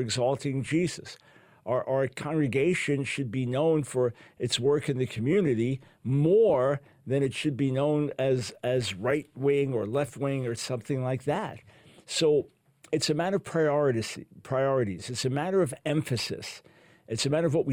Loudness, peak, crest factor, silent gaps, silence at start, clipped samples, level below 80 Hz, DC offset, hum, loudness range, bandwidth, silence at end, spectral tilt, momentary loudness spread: -28 LUFS; -14 dBFS; 14 dB; none; 0 s; under 0.1%; -64 dBFS; under 0.1%; none; 3 LU; 16 kHz; 0 s; -5.5 dB/octave; 8 LU